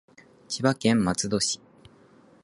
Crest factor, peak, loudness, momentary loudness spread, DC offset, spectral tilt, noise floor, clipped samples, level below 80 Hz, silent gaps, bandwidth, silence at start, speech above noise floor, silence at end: 22 dB; -6 dBFS; -25 LUFS; 10 LU; under 0.1%; -4 dB/octave; -56 dBFS; under 0.1%; -56 dBFS; none; 11.5 kHz; 0.5 s; 31 dB; 0.9 s